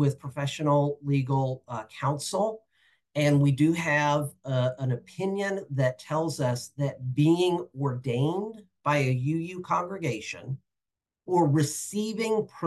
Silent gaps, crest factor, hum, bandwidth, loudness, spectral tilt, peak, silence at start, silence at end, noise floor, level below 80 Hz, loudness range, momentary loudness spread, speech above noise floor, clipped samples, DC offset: none; 16 dB; none; 12.5 kHz; -27 LUFS; -6 dB/octave; -10 dBFS; 0 s; 0 s; -89 dBFS; -72 dBFS; 3 LU; 10 LU; 62 dB; under 0.1%; under 0.1%